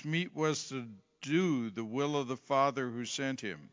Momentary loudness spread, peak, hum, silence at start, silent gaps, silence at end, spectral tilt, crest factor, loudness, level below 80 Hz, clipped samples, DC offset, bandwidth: 11 LU; -16 dBFS; none; 0 s; none; 0.05 s; -5 dB/octave; 18 dB; -34 LUFS; -80 dBFS; under 0.1%; under 0.1%; 7.6 kHz